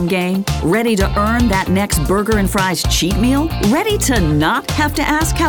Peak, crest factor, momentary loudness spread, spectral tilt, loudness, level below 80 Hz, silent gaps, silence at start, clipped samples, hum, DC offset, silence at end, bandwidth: -2 dBFS; 14 dB; 2 LU; -4.5 dB/octave; -15 LUFS; -24 dBFS; none; 0 s; under 0.1%; none; under 0.1%; 0 s; over 20 kHz